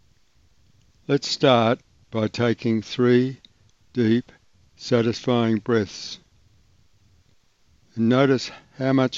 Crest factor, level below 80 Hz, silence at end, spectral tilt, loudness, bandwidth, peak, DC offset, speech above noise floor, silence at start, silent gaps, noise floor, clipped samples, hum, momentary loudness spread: 20 dB; -62 dBFS; 0 s; -6 dB/octave; -22 LUFS; 7.8 kHz; -2 dBFS; under 0.1%; 41 dB; 1.1 s; none; -62 dBFS; under 0.1%; none; 16 LU